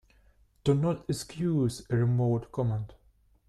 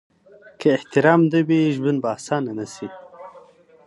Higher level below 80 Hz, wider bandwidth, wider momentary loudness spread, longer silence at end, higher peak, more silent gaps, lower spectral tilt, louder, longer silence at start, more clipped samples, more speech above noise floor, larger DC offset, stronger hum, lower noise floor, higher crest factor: first, -56 dBFS vs -68 dBFS; about the same, 12.5 kHz vs 11.5 kHz; second, 8 LU vs 19 LU; about the same, 0.55 s vs 0.45 s; second, -12 dBFS vs -2 dBFS; neither; about the same, -7.5 dB/octave vs -7 dB/octave; second, -29 LUFS vs -20 LUFS; about the same, 0.65 s vs 0.6 s; neither; first, 36 dB vs 30 dB; neither; neither; first, -64 dBFS vs -49 dBFS; about the same, 18 dB vs 20 dB